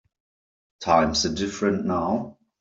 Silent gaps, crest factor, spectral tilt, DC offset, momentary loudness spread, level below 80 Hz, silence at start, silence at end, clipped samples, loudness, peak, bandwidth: none; 20 dB; -4.5 dB/octave; under 0.1%; 11 LU; -52 dBFS; 0.8 s; 0.3 s; under 0.1%; -24 LUFS; -6 dBFS; 7.8 kHz